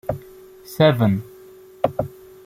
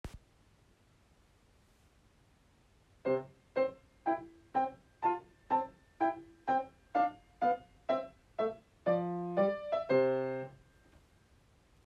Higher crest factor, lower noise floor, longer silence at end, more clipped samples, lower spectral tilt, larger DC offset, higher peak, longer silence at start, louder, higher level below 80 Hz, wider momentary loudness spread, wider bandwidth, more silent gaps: about the same, 22 dB vs 18 dB; second, -45 dBFS vs -67 dBFS; second, 0.4 s vs 1.35 s; neither; about the same, -7.5 dB/octave vs -7.5 dB/octave; neither; first, -2 dBFS vs -18 dBFS; about the same, 0.1 s vs 0.05 s; first, -20 LUFS vs -35 LUFS; first, -50 dBFS vs -66 dBFS; first, 19 LU vs 8 LU; first, 16 kHz vs 9.6 kHz; neither